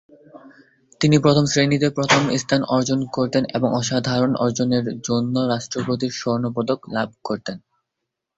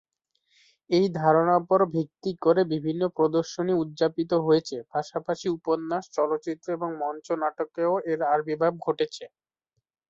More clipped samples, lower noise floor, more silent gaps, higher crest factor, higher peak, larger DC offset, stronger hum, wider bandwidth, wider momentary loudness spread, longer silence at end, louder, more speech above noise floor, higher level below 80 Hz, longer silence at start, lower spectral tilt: neither; about the same, -81 dBFS vs -81 dBFS; neither; about the same, 18 dB vs 18 dB; first, -2 dBFS vs -8 dBFS; neither; neither; about the same, 8 kHz vs 7.8 kHz; about the same, 9 LU vs 9 LU; about the same, 0.8 s vs 0.8 s; first, -20 LUFS vs -26 LUFS; first, 61 dB vs 55 dB; first, -56 dBFS vs -70 dBFS; second, 0.35 s vs 0.9 s; second, -5 dB/octave vs -6.5 dB/octave